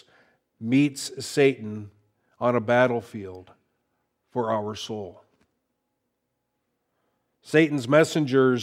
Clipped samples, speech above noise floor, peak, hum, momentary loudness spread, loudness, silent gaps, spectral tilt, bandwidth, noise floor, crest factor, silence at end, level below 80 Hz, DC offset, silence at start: under 0.1%; 55 dB; -4 dBFS; none; 17 LU; -23 LUFS; none; -5.5 dB/octave; 15.5 kHz; -78 dBFS; 22 dB; 0 s; -74 dBFS; under 0.1%; 0.6 s